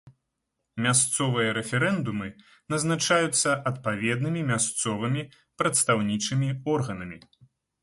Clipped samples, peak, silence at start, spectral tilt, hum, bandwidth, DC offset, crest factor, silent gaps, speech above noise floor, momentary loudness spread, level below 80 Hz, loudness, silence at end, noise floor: under 0.1%; -8 dBFS; 0.05 s; -4 dB/octave; none; 12 kHz; under 0.1%; 18 dB; none; 55 dB; 11 LU; -60 dBFS; -25 LUFS; 0.65 s; -81 dBFS